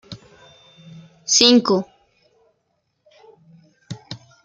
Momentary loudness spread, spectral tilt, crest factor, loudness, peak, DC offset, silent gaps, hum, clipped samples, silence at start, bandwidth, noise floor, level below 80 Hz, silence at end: 27 LU; -2.5 dB/octave; 24 dB; -15 LUFS; 0 dBFS; under 0.1%; none; none; under 0.1%; 0.1 s; 10 kHz; -71 dBFS; -64 dBFS; 0.3 s